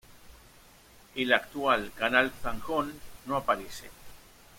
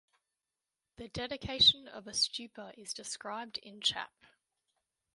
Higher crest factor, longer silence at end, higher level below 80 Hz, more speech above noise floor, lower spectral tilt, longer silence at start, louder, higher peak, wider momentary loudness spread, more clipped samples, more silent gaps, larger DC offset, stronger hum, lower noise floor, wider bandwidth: about the same, 26 dB vs 24 dB; second, 0.4 s vs 1.1 s; first, -52 dBFS vs -64 dBFS; second, 27 dB vs over 55 dB; first, -4 dB/octave vs -1.5 dB/octave; second, 0.1 s vs 1 s; about the same, -29 LUFS vs -31 LUFS; first, -6 dBFS vs -12 dBFS; second, 18 LU vs 22 LU; neither; neither; neither; neither; second, -56 dBFS vs under -90 dBFS; first, 16.5 kHz vs 11.5 kHz